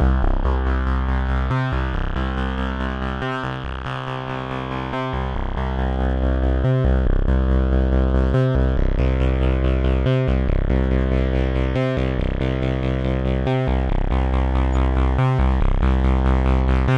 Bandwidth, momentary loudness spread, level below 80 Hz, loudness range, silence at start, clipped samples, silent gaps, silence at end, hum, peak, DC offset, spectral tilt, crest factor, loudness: 5.6 kHz; 6 LU; -20 dBFS; 6 LU; 0 s; under 0.1%; none; 0 s; none; -6 dBFS; under 0.1%; -8.5 dB/octave; 14 dB; -21 LUFS